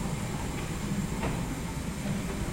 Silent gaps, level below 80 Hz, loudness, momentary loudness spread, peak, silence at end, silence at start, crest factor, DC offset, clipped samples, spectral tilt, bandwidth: none; -40 dBFS; -33 LUFS; 2 LU; -20 dBFS; 0 s; 0 s; 12 dB; under 0.1%; under 0.1%; -5.5 dB/octave; 16.5 kHz